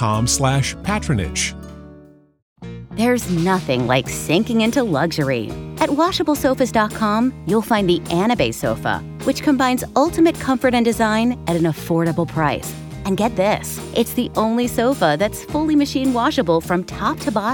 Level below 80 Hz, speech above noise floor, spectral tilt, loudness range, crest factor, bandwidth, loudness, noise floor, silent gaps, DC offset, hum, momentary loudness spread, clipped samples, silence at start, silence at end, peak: -40 dBFS; 27 dB; -5 dB/octave; 3 LU; 16 dB; over 20 kHz; -19 LUFS; -46 dBFS; 2.42-2.56 s; under 0.1%; none; 6 LU; under 0.1%; 0 s; 0 s; -2 dBFS